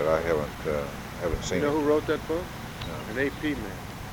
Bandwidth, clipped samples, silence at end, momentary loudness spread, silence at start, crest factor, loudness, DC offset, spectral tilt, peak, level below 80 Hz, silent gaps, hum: over 20 kHz; under 0.1%; 0 s; 11 LU; 0 s; 18 dB; -29 LUFS; under 0.1%; -5.5 dB/octave; -10 dBFS; -42 dBFS; none; none